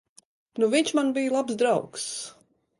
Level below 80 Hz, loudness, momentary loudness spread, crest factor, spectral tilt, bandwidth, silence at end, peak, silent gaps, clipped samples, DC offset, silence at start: -74 dBFS; -25 LUFS; 13 LU; 18 dB; -3.5 dB/octave; 11.5 kHz; 0.5 s; -10 dBFS; none; under 0.1%; under 0.1%; 0.55 s